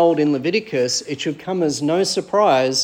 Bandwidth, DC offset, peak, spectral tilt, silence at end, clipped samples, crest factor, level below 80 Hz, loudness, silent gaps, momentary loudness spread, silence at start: 16.5 kHz; under 0.1%; -4 dBFS; -4 dB/octave; 0 s; under 0.1%; 14 dB; -66 dBFS; -19 LUFS; none; 7 LU; 0 s